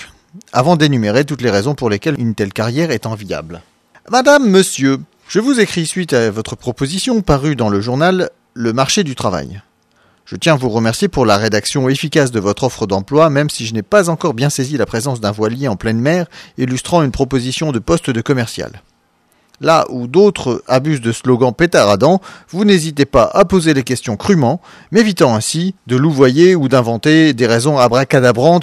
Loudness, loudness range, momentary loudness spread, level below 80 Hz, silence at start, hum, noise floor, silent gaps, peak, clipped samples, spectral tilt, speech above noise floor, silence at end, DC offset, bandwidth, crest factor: -14 LUFS; 4 LU; 9 LU; -40 dBFS; 0 s; none; -57 dBFS; none; 0 dBFS; under 0.1%; -5.5 dB/octave; 44 dB; 0 s; under 0.1%; 14.5 kHz; 14 dB